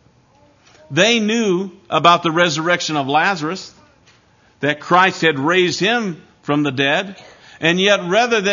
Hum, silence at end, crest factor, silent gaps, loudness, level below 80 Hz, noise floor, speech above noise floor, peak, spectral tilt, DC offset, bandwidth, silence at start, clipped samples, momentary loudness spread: none; 0 s; 18 dB; none; -16 LUFS; -64 dBFS; -53 dBFS; 37 dB; 0 dBFS; -4 dB/octave; under 0.1%; 7.4 kHz; 0.9 s; under 0.1%; 9 LU